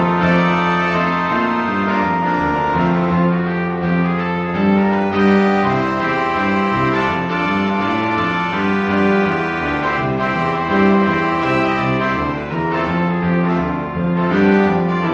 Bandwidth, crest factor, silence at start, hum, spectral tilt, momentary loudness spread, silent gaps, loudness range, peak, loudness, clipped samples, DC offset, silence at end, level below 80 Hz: 7.2 kHz; 14 dB; 0 s; none; -7.5 dB/octave; 5 LU; none; 1 LU; -2 dBFS; -16 LUFS; under 0.1%; under 0.1%; 0 s; -42 dBFS